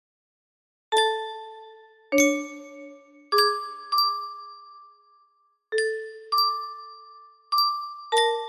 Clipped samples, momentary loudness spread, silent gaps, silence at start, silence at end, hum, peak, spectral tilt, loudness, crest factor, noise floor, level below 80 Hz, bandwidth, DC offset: under 0.1%; 22 LU; none; 0.9 s; 0 s; none; -8 dBFS; 0 dB/octave; -24 LUFS; 20 dB; -66 dBFS; -76 dBFS; 15.5 kHz; under 0.1%